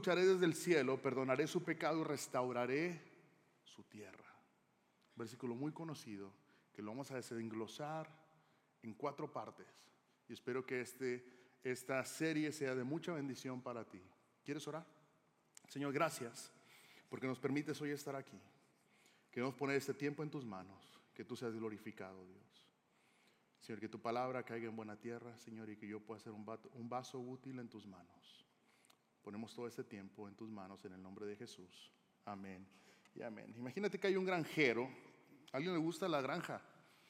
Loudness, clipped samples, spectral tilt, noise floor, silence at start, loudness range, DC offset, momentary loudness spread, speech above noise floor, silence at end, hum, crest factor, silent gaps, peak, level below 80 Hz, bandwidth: -43 LUFS; under 0.1%; -5 dB/octave; -78 dBFS; 0 s; 12 LU; under 0.1%; 20 LU; 34 dB; 0.4 s; none; 24 dB; none; -22 dBFS; under -90 dBFS; 16 kHz